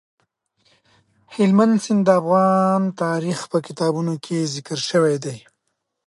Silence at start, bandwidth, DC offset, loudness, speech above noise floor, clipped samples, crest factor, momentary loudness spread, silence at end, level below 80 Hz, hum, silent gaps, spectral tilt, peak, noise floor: 1.3 s; 11.5 kHz; under 0.1%; -19 LUFS; 56 dB; under 0.1%; 18 dB; 9 LU; 0.7 s; -70 dBFS; none; none; -6 dB/octave; -2 dBFS; -75 dBFS